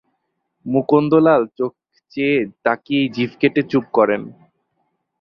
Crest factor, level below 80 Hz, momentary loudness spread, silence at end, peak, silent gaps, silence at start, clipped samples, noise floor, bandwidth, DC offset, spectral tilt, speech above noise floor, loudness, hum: 18 dB; -62 dBFS; 12 LU; 0.9 s; -2 dBFS; none; 0.65 s; under 0.1%; -73 dBFS; 6 kHz; under 0.1%; -8.5 dB/octave; 56 dB; -18 LUFS; none